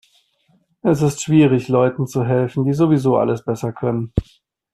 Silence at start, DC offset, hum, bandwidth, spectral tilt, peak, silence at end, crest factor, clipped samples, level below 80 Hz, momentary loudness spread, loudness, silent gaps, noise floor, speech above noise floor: 0.85 s; under 0.1%; none; 13.5 kHz; -7.5 dB/octave; -2 dBFS; 0.5 s; 16 dB; under 0.1%; -40 dBFS; 8 LU; -18 LUFS; none; -61 dBFS; 44 dB